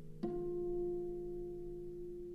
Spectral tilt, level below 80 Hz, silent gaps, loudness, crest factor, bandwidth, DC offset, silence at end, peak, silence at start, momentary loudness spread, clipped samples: -10 dB/octave; -54 dBFS; none; -43 LUFS; 14 dB; 5.2 kHz; under 0.1%; 0 s; -28 dBFS; 0 s; 8 LU; under 0.1%